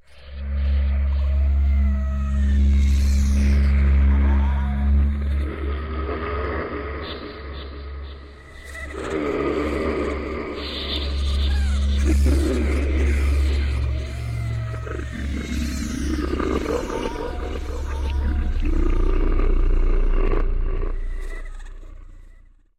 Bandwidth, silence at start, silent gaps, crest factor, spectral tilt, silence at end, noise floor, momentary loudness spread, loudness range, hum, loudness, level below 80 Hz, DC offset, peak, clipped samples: 10.5 kHz; 0.1 s; none; 12 dB; -7 dB/octave; 0.45 s; -48 dBFS; 15 LU; 8 LU; none; -23 LUFS; -22 dBFS; under 0.1%; -8 dBFS; under 0.1%